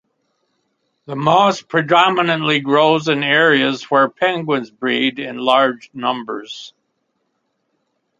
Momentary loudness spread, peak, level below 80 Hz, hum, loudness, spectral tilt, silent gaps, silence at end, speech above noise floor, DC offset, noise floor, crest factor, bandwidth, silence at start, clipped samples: 11 LU; 0 dBFS; -66 dBFS; none; -16 LUFS; -5 dB/octave; none; 1.5 s; 53 dB; under 0.1%; -70 dBFS; 18 dB; 7.8 kHz; 1.1 s; under 0.1%